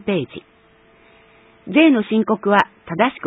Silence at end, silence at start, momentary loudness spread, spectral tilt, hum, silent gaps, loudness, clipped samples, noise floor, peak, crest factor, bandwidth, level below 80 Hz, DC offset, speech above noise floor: 0 s; 0.05 s; 12 LU; -7.5 dB/octave; none; none; -17 LUFS; under 0.1%; -52 dBFS; 0 dBFS; 20 dB; 7.6 kHz; -60 dBFS; under 0.1%; 35 dB